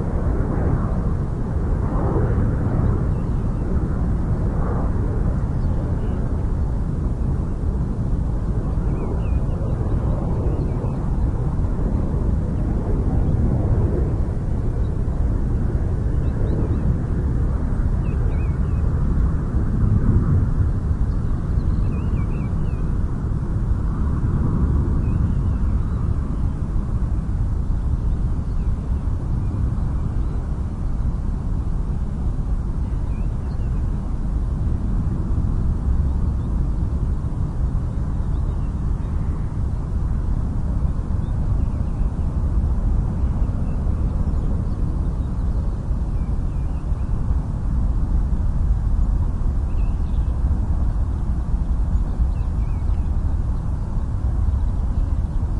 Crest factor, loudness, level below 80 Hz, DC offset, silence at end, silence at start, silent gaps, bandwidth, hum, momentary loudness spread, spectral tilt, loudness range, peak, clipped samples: 14 dB; -23 LUFS; -22 dBFS; under 0.1%; 0 s; 0 s; none; 4.9 kHz; none; 4 LU; -10 dB/octave; 3 LU; -4 dBFS; under 0.1%